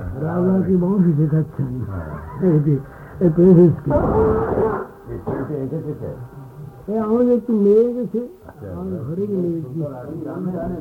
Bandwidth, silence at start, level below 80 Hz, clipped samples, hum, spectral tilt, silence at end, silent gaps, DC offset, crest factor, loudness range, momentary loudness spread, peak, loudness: 3.3 kHz; 0 s; -40 dBFS; under 0.1%; none; -11.5 dB/octave; 0 s; none; under 0.1%; 16 dB; 5 LU; 17 LU; -2 dBFS; -19 LUFS